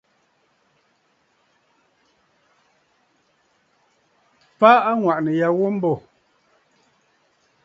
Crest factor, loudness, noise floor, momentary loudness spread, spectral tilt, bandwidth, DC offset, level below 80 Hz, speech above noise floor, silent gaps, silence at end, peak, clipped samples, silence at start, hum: 24 dB; -18 LUFS; -65 dBFS; 10 LU; -8 dB/octave; 7.6 kHz; under 0.1%; -70 dBFS; 48 dB; none; 1.65 s; 0 dBFS; under 0.1%; 4.6 s; none